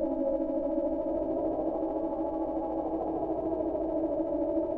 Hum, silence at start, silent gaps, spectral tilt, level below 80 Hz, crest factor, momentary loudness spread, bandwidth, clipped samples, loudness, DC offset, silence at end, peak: none; 0 s; none; -11 dB/octave; -52 dBFS; 12 dB; 2 LU; 3.2 kHz; under 0.1%; -31 LUFS; under 0.1%; 0 s; -18 dBFS